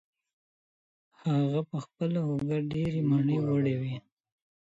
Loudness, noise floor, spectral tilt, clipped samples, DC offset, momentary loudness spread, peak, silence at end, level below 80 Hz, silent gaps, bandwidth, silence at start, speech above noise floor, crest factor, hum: -30 LUFS; under -90 dBFS; -9 dB/octave; under 0.1%; under 0.1%; 10 LU; -16 dBFS; 0.65 s; -62 dBFS; none; 7.8 kHz; 1.25 s; over 62 dB; 14 dB; none